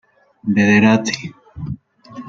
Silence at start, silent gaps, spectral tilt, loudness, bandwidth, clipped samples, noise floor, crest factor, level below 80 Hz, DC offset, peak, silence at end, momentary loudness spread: 0.45 s; none; -5.5 dB/octave; -15 LUFS; 7.6 kHz; under 0.1%; -37 dBFS; 16 dB; -50 dBFS; under 0.1%; -2 dBFS; 0 s; 21 LU